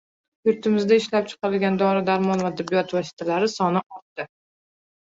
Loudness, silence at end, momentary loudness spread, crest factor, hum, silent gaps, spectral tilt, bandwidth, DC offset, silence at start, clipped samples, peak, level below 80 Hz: -22 LUFS; 0.8 s; 15 LU; 16 dB; none; 3.13-3.17 s, 3.86-3.90 s, 4.02-4.16 s; -6 dB/octave; 7.8 kHz; under 0.1%; 0.45 s; under 0.1%; -6 dBFS; -66 dBFS